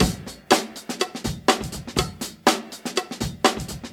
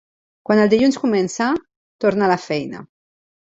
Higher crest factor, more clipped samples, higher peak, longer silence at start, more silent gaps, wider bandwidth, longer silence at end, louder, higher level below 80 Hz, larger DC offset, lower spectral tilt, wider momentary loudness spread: first, 24 dB vs 18 dB; neither; about the same, -2 dBFS vs -2 dBFS; second, 0 s vs 0.5 s; second, none vs 1.76-1.99 s; first, 19 kHz vs 8 kHz; second, 0 s vs 0.55 s; second, -24 LUFS vs -18 LUFS; first, -40 dBFS vs -58 dBFS; neither; second, -3.5 dB/octave vs -5.5 dB/octave; second, 9 LU vs 14 LU